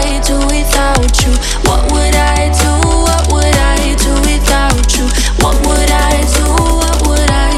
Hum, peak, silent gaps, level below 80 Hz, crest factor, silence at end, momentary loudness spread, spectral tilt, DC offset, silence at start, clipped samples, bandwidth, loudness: none; 0 dBFS; none; -12 dBFS; 10 dB; 0 s; 2 LU; -4 dB/octave; under 0.1%; 0 s; under 0.1%; 15 kHz; -11 LUFS